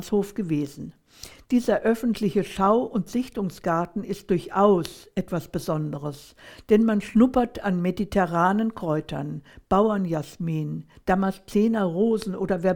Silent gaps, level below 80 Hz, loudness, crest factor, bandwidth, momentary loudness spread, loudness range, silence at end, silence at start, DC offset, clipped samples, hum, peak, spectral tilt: none; -50 dBFS; -24 LUFS; 18 dB; 18 kHz; 12 LU; 2 LU; 0 s; 0 s; under 0.1%; under 0.1%; none; -6 dBFS; -7 dB/octave